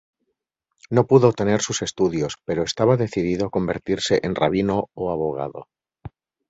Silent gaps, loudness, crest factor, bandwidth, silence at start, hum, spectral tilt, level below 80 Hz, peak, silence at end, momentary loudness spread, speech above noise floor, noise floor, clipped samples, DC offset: none; -21 LUFS; 20 dB; 8 kHz; 0.9 s; none; -5.5 dB/octave; -50 dBFS; -2 dBFS; 0.4 s; 10 LU; 57 dB; -77 dBFS; under 0.1%; under 0.1%